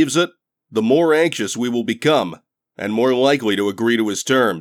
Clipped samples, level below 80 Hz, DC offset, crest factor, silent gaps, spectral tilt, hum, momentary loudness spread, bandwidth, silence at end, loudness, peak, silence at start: under 0.1%; -72 dBFS; under 0.1%; 14 dB; none; -4.5 dB/octave; none; 8 LU; 17 kHz; 0 s; -18 LUFS; -4 dBFS; 0 s